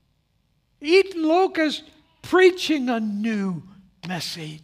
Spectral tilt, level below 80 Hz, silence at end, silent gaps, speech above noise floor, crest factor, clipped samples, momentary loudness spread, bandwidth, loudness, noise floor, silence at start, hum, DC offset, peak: -5 dB/octave; -64 dBFS; 0.05 s; none; 46 dB; 18 dB; under 0.1%; 15 LU; 15 kHz; -21 LUFS; -67 dBFS; 0.8 s; none; under 0.1%; -4 dBFS